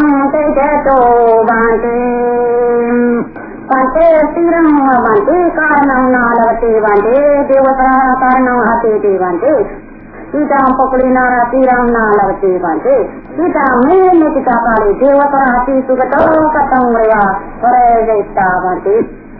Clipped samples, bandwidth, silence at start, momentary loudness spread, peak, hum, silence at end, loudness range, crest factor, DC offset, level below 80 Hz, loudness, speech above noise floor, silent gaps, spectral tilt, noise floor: under 0.1%; 4 kHz; 0 s; 5 LU; 0 dBFS; none; 0 s; 2 LU; 10 dB; under 0.1%; -34 dBFS; -10 LUFS; 21 dB; none; -11 dB/octave; -30 dBFS